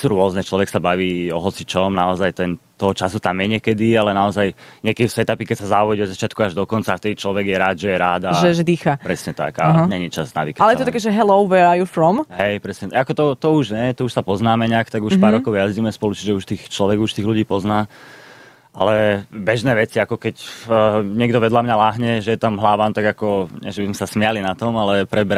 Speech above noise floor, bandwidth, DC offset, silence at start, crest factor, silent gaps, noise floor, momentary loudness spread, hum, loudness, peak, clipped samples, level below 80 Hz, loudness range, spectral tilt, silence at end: 27 dB; 15 kHz; under 0.1%; 0 s; 16 dB; none; -45 dBFS; 8 LU; none; -18 LUFS; -2 dBFS; under 0.1%; -52 dBFS; 3 LU; -6 dB/octave; 0 s